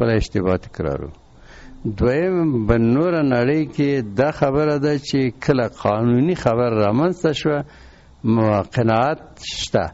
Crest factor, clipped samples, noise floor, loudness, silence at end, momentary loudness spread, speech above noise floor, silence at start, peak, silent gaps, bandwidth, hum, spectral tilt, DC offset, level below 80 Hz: 14 dB; under 0.1%; -42 dBFS; -19 LUFS; 0 s; 8 LU; 23 dB; 0 s; -6 dBFS; none; 8 kHz; none; -6 dB/octave; under 0.1%; -38 dBFS